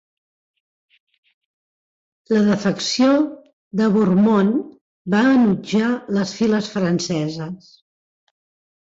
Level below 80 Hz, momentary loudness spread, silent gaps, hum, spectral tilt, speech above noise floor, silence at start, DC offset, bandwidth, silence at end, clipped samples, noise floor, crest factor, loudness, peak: -60 dBFS; 12 LU; 3.53-3.71 s, 4.81-5.05 s; none; -6 dB/octave; over 72 dB; 2.3 s; under 0.1%; 7.8 kHz; 1.25 s; under 0.1%; under -90 dBFS; 14 dB; -18 LUFS; -6 dBFS